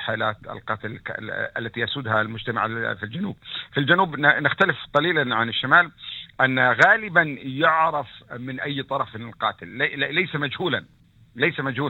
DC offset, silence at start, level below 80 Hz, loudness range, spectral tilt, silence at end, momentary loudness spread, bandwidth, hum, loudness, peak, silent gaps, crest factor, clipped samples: under 0.1%; 0 s; -60 dBFS; 7 LU; -6 dB/octave; 0 s; 13 LU; 17.5 kHz; none; -22 LUFS; -2 dBFS; none; 22 dB; under 0.1%